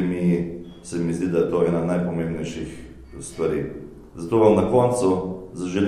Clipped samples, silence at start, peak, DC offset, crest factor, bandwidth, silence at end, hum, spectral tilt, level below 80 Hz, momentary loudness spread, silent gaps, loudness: under 0.1%; 0 s; -4 dBFS; 0.1%; 18 dB; 12 kHz; 0 s; none; -7 dB/octave; -46 dBFS; 19 LU; none; -22 LUFS